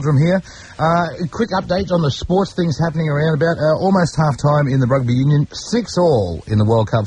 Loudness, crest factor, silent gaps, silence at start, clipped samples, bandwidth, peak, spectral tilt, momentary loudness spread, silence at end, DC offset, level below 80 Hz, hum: -17 LUFS; 12 dB; none; 0 s; under 0.1%; 9.6 kHz; -4 dBFS; -7 dB/octave; 5 LU; 0 s; under 0.1%; -40 dBFS; none